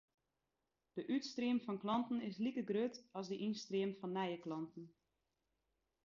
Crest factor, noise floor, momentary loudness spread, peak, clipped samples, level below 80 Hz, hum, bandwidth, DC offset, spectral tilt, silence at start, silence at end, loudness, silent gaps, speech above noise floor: 16 dB; -89 dBFS; 10 LU; -26 dBFS; under 0.1%; -84 dBFS; none; 7.2 kHz; under 0.1%; -5 dB/octave; 0.95 s; 1.2 s; -42 LUFS; none; 48 dB